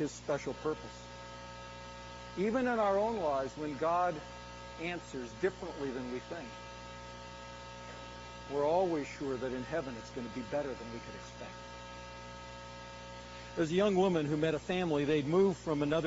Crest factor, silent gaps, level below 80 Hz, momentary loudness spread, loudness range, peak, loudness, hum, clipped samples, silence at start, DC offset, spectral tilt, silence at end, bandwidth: 18 dB; none; -58 dBFS; 17 LU; 9 LU; -18 dBFS; -34 LUFS; 60 Hz at -55 dBFS; under 0.1%; 0 s; under 0.1%; -5 dB/octave; 0 s; 7.6 kHz